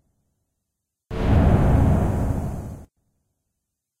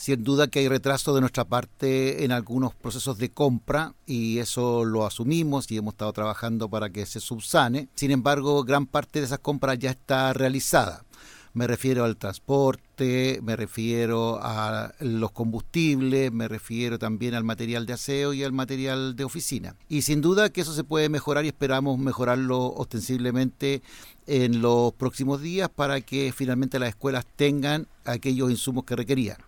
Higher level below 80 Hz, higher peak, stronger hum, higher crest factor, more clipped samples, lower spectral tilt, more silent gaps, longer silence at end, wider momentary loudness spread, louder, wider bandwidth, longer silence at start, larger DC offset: first, -28 dBFS vs -52 dBFS; about the same, -6 dBFS vs -6 dBFS; neither; about the same, 16 dB vs 18 dB; neither; first, -9 dB/octave vs -5.5 dB/octave; neither; first, 1.15 s vs 0.05 s; first, 17 LU vs 8 LU; first, -21 LUFS vs -26 LUFS; second, 13.5 kHz vs 19 kHz; first, 1.1 s vs 0 s; neither